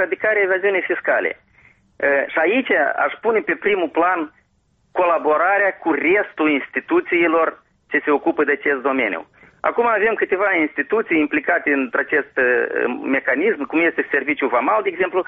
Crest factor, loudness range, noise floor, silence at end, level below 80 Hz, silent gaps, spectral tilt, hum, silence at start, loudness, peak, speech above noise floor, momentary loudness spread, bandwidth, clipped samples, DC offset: 16 dB; 1 LU; -63 dBFS; 0.05 s; -62 dBFS; none; -2 dB/octave; none; 0 s; -18 LUFS; -4 dBFS; 44 dB; 5 LU; 4.6 kHz; under 0.1%; under 0.1%